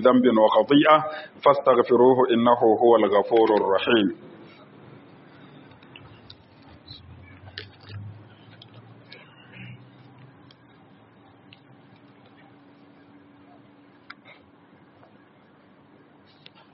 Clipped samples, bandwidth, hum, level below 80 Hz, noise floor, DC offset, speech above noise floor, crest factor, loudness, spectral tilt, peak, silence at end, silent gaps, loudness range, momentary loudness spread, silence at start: under 0.1%; 5.8 kHz; none; -68 dBFS; -55 dBFS; under 0.1%; 36 dB; 22 dB; -19 LUFS; -4 dB/octave; -2 dBFS; 6.95 s; none; 27 LU; 26 LU; 0 s